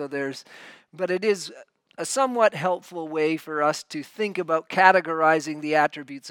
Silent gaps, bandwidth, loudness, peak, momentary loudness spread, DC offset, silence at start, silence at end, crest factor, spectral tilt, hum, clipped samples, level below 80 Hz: none; 18 kHz; -23 LUFS; 0 dBFS; 14 LU; under 0.1%; 0 s; 0 s; 24 dB; -4 dB/octave; none; under 0.1%; -82 dBFS